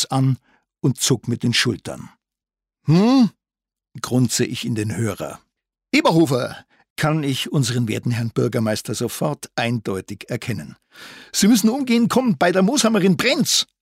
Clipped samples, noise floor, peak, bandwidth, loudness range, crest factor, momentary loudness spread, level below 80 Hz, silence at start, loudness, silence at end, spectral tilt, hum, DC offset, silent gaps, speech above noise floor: under 0.1%; -89 dBFS; -6 dBFS; 16 kHz; 4 LU; 14 dB; 14 LU; -58 dBFS; 0 s; -19 LUFS; 0.2 s; -4.5 dB/octave; none; under 0.1%; 6.90-6.96 s; 70 dB